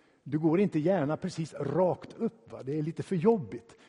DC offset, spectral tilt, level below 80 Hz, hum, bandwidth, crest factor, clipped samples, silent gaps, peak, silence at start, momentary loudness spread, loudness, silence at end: under 0.1%; -8 dB/octave; -68 dBFS; none; 10.5 kHz; 20 dB; under 0.1%; none; -10 dBFS; 0.25 s; 9 LU; -30 LUFS; 0.3 s